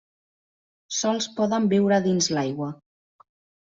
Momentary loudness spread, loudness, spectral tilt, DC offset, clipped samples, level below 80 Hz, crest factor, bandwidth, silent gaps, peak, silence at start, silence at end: 10 LU; -23 LUFS; -4.5 dB/octave; under 0.1%; under 0.1%; -66 dBFS; 18 dB; 7.8 kHz; none; -8 dBFS; 0.9 s; 1 s